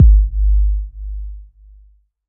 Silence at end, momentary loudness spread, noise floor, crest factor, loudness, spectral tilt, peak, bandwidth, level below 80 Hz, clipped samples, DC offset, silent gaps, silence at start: 0.85 s; 19 LU; -50 dBFS; 14 dB; -18 LUFS; -18.5 dB/octave; 0 dBFS; 0.4 kHz; -16 dBFS; under 0.1%; under 0.1%; none; 0 s